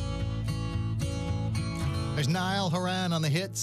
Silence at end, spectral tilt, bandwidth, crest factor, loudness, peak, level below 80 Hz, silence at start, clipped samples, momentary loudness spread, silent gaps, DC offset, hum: 0 s; -5 dB/octave; 14.5 kHz; 12 dB; -30 LUFS; -18 dBFS; -42 dBFS; 0 s; under 0.1%; 4 LU; none; under 0.1%; none